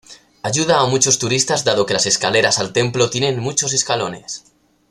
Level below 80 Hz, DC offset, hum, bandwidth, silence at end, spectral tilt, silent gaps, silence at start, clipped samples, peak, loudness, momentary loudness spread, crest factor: -54 dBFS; under 0.1%; none; 14.5 kHz; 0.5 s; -2.5 dB/octave; none; 0.1 s; under 0.1%; 0 dBFS; -16 LUFS; 10 LU; 18 dB